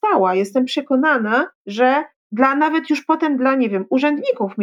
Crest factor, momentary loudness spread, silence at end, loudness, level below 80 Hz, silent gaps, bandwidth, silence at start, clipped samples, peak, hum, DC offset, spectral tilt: 16 dB; 4 LU; 0 s; -18 LUFS; -70 dBFS; 1.55-1.65 s, 2.16-2.30 s; 11.5 kHz; 0.05 s; under 0.1%; -2 dBFS; none; under 0.1%; -5.5 dB/octave